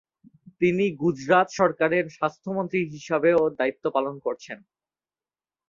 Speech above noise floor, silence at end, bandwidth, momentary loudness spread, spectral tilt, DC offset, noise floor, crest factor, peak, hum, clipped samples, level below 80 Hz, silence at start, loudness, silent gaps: over 66 dB; 1.1 s; 7.4 kHz; 11 LU; -6.5 dB/octave; under 0.1%; under -90 dBFS; 20 dB; -6 dBFS; none; under 0.1%; -66 dBFS; 0.6 s; -24 LUFS; none